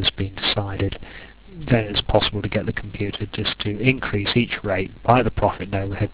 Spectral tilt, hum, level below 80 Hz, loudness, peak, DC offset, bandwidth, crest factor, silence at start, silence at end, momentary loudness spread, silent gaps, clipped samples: -10 dB/octave; none; -36 dBFS; -22 LUFS; 0 dBFS; 0.2%; 4 kHz; 22 dB; 0 s; 0 s; 10 LU; none; under 0.1%